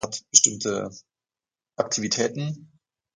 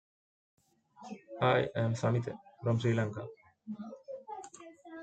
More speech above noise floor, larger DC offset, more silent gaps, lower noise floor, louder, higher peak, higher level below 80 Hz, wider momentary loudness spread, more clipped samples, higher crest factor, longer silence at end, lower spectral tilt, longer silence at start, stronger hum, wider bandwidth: first, over 65 dB vs 20 dB; neither; neither; first, under -90 dBFS vs -52 dBFS; first, -22 LUFS vs -33 LUFS; first, -2 dBFS vs -14 dBFS; first, -64 dBFS vs -72 dBFS; second, 17 LU vs 21 LU; neither; first, 26 dB vs 20 dB; first, 0.5 s vs 0 s; second, -2 dB/octave vs -7 dB/octave; second, 0 s vs 1 s; neither; first, 11.5 kHz vs 8.8 kHz